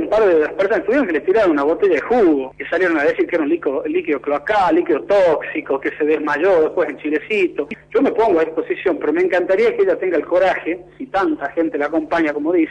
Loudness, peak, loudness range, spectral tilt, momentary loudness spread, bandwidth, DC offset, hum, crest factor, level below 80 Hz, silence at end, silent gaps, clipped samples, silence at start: -17 LUFS; -6 dBFS; 1 LU; -6 dB/octave; 6 LU; 9.4 kHz; under 0.1%; none; 10 dB; -52 dBFS; 0 s; none; under 0.1%; 0 s